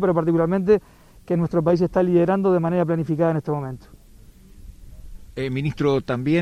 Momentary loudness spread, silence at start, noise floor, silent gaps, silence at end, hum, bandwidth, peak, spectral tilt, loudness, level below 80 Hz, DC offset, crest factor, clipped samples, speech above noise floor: 9 LU; 0 s; -47 dBFS; none; 0 s; none; 10 kHz; -4 dBFS; -9 dB/octave; -21 LUFS; -46 dBFS; under 0.1%; 16 dB; under 0.1%; 27 dB